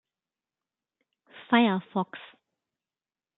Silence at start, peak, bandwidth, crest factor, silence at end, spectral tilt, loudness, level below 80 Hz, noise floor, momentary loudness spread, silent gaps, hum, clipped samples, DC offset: 1.35 s; -6 dBFS; 4.1 kHz; 24 dB; 1.15 s; -9.5 dB/octave; -26 LUFS; -82 dBFS; under -90 dBFS; 15 LU; none; none; under 0.1%; under 0.1%